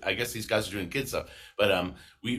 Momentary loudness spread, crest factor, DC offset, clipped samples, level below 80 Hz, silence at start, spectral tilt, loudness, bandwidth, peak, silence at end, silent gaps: 12 LU; 20 dB; under 0.1%; under 0.1%; -54 dBFS; 0 s; -4 dB/octave; -30 LUFS; 15.5 kHz; -10 dBFS; 0 s; none